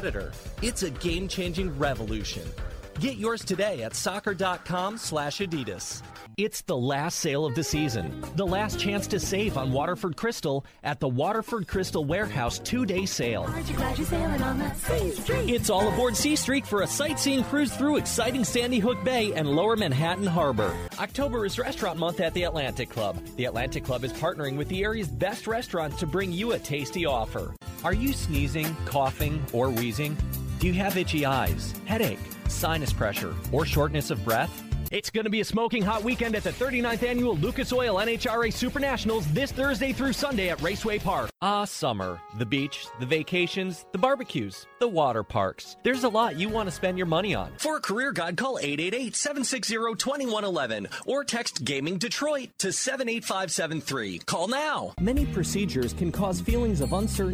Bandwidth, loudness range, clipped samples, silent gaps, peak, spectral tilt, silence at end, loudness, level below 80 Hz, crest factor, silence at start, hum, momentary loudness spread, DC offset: 16.5 kHz; 4 LU; under 0.1%; none; -10 dBFS; -4.5 dB/octave; 0 s; -28 LUFS; -40 dBFS; 18 dB; 0 s; none; 6 LU; under 0.1%